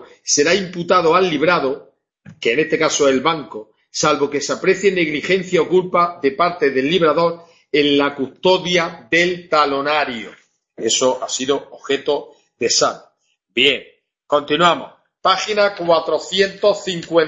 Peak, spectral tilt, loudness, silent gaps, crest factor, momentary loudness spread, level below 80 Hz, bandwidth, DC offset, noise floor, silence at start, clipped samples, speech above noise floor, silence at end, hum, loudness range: 0 dBFS; -3 dB/octave; -17 LUFS; none; 18 dB; 9 LU; -58 dBFS; 8.4 kHz; under 0.1%; -62 dBFS; 0 s; under 0.1%; 45 dB; 0 s; none; 3 LU